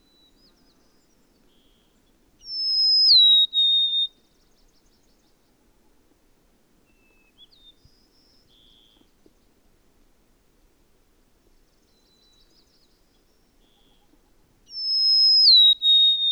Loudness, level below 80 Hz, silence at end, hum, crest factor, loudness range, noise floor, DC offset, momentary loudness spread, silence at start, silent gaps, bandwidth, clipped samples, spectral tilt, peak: -15 LUFS; -64 dBFS; 0 s; none; 18 dB; 11 LU; -62 dBFS; under 0.1%; 16 LU; 2.45 s; none; 16 kHz; under 0.1%; 0.5 dB/octave; -8 dBFS